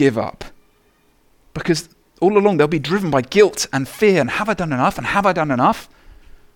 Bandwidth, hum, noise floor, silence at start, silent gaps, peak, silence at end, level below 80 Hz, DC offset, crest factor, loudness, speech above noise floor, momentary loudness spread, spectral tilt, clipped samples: 17.5 kHz; none; -57 dBFS; 0 s; none; 0 dBFS; 0.45 s; -46 dBFS; under 0.1%; 18 dB; -17 LUFS; 41 dB; 11 LU; -5.5 dB/octave; under 0.1%